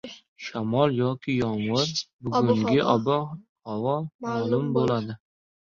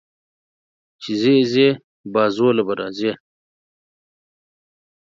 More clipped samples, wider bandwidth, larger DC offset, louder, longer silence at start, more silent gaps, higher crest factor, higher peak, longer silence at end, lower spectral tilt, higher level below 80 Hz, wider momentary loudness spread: neither; about the same, 7.4 kHz vs 7.6 kHz; neither; second, -25 LUFS vs -18 LUFS; second, 0.05 s vs 1 s; first, 0.28-0.36 s, 2.13-2.19 s, 3.49-3.56 s, 4.14-4.19 s vs 1.84-2.04 s; about the same, 18 dB vs 18 dB; second, -8 dBFS vs -2 dBFS; second, 0.5 s vs 2 s; about the same, -6 dB/octave vs -6.5 dB/octave; first, -60 dBFS vs -68 dBFS; about the same, 15 LU vs 13 LU